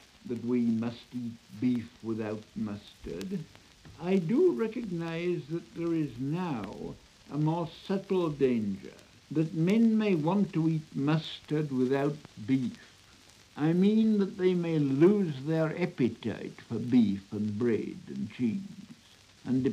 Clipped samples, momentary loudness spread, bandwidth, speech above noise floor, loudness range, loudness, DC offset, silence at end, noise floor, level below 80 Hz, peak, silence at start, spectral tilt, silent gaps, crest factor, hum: under 0.1%; 15 LU; 10.5 kHz; 28 dB; 6 LU; -30 LUFS; under 0.1%; 0 s; -58 dBFS; -64 dBFS; -12 dBFS; 0.25 s; -8 dB/octave; none; 18 dB; none